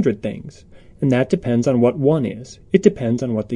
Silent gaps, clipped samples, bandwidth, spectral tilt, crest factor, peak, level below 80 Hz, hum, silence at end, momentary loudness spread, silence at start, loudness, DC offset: none; under 0.1%; 10.5 kHz; -7.5 dB/octave; 18 dB; 0 dBFS; -50 dBFS; none; 0 s; 11 LU; 0 s; -19 LUFS; under 0.1%